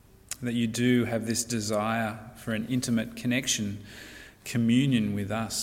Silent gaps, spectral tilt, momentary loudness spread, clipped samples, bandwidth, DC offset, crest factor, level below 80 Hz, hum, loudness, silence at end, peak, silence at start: none; -4.5 dB/octave; 16 LU; under 0.1%; 16.5 kHz; under 0.1%; 16 dB; -58 dBFS; none; -28 LUFS; 0 s; -12 dBFS; 0.3 s